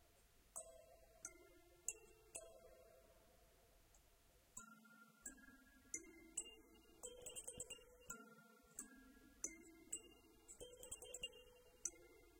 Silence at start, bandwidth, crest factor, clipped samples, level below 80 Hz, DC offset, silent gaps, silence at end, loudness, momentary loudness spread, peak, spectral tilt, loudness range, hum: 0 s; 16.5 kHz; 34 dB; under 0.1%; -76 dBFS; under 0.1%; none; 0 s; -55 LUFS; 16 LU; -26 dBFS; -1 dB/octave; 8 LU; none